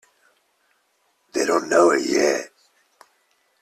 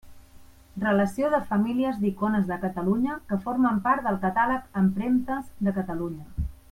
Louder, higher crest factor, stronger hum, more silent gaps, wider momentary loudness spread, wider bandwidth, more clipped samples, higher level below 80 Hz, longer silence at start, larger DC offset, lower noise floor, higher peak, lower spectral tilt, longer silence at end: first, -20 LUFS vs -26 LUFS; about the same, 20 dB vs 16 dB; neither; neither; first, 12 LU vs 9 LU; second, 14 kHz vs 15.5 kHz; neither; second, -68 dBFS vs -46 dBFS; first, 1.35 s vs 0.05 s; neither; first, -67 dBFS vs -50 dBFS; first, -4 dBFS vs -10 dBFS; second, -3 dB/octave vs -8 dB/octave; first, 1.15 s vs 0.15 s